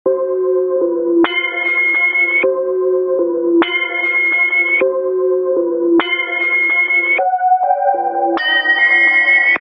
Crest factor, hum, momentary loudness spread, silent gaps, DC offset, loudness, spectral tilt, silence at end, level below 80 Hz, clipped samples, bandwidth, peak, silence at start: 12 dB; none; 7 LU; none; under 0.1%; -13 LUFS; -5.5 dB/octave; 0 s; -68 dBFS; under 0.1%; 5.4 kHz; -2 dBFS; 0.05 s